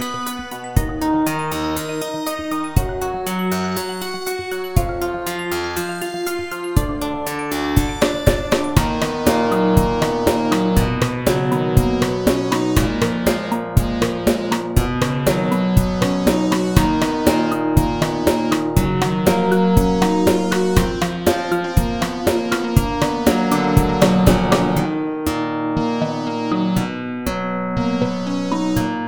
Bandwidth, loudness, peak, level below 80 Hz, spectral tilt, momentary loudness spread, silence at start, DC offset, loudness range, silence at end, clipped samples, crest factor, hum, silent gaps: over 20 kHz; -19 LUFS; 0 dBFS; -30 dBFS; -6 dB/octave; 8 LU; 0 s; under 0.1%; 5 LU; 0 s; under 0.1%; 18 dB; none; none